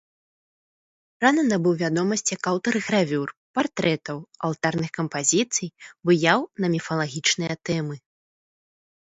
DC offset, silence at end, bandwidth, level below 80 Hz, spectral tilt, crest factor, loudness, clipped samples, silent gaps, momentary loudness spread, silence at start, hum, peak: under 0.1%; 1.1 s; 8 kHz; -66 dBFS; -4 dB/octave; 22 dB; -23 LUFS; under 0.1%; 3.37-3.54 s; 9 LU; 1.2 s; none; -2 dBFS